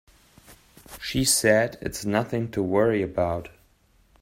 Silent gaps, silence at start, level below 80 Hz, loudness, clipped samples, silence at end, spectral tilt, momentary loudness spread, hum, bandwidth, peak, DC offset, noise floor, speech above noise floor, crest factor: none; 0.5 s; -50 dBFS; -24 LUFS; under 0.1%; 0.75 s; -4 dB/octave; 13 LU; none; 16 kHz; -4 dBFS; under 0.1%; -61 dBFS; 37 dB; 22 dB